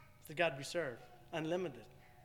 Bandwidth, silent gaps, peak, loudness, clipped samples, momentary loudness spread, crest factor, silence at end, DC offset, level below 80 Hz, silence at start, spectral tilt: 19 kHz; none; -20 dBFS; -40 LUFS; under 0.1%; 19 LU; 22 dB; 0 s; under 0.1%; -70 dBFS; 0 s; -4.5 dB/octave